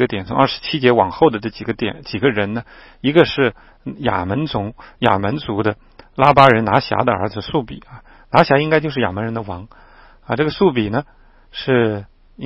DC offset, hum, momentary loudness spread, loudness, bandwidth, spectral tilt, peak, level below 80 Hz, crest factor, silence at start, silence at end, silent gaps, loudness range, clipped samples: under 0.1%; none; 15 LU; -17 LUFS; 8.6 kHz; -8 dB/octave; 0 dBFS; -44 dBFS; 18 dB; 0 s; 0 s; none; 4 LU; under 0.1%